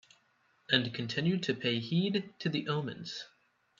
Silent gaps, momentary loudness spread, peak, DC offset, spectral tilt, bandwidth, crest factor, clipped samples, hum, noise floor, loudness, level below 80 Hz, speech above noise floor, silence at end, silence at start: none; 12 LU; -10 dBFS; under 0.1%; -6 dB/octave; 7.4 kHz; 24 dB; under 0.1%; none; -71 dBFS; -33 LUFS; -74 dBFS; 38 dB; 0.55 s; 0.7 s